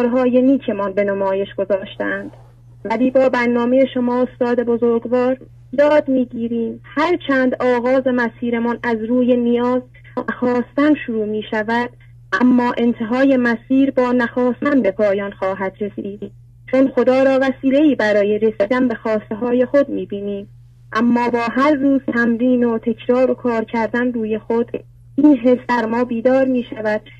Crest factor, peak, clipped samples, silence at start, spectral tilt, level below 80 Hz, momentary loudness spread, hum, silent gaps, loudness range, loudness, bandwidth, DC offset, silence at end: 14 dB; -2 dBFS; under 0.1%; 0 s; -7 dB/octave; -52 dBFS; 9 LU; none; none; 2 LU; -17 LUFS; 7.4 kHz; under 0.1%; 0.1 s